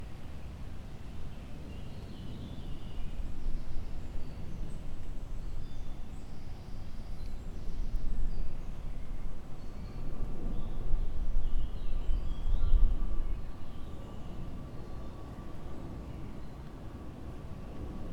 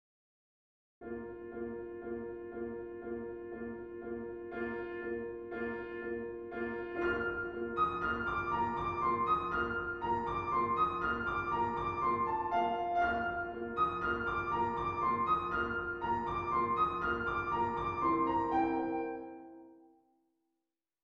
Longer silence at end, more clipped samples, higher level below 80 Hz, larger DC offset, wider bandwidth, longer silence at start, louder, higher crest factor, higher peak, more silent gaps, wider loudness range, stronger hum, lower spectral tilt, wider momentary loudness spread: second, 0 s vs 1.25 s; neither; first, -34 dBFS vs -58 dBFS; first, 0.2% vs under 0.1%; second, 4.9 kHz vs 7 kHz; second, 0 s vs 1 s; second, -42 LUFS vs -35 LUFS; about the same, 20 dB vs 16 dB; first, -10 dBFS vs -20 dBFS; neither; about the same, 8 LU vs 9 LU; neither; about the same, -7.5 dB/octave vs -7.5 dB/octave; second, 8 LU vs 11 LU